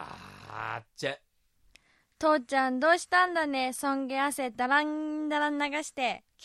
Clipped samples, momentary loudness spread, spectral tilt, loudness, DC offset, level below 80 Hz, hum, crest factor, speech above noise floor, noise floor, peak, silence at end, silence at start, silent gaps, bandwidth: under 0.1%; 13 LU; -3 dB/octave; -29 LUFS; under 0.1%; -70 dBFS; none; 20 dB; 38 dB; -67 dBFS; -10 dBFS; 0.25 s; 0 s; none; 14 kHz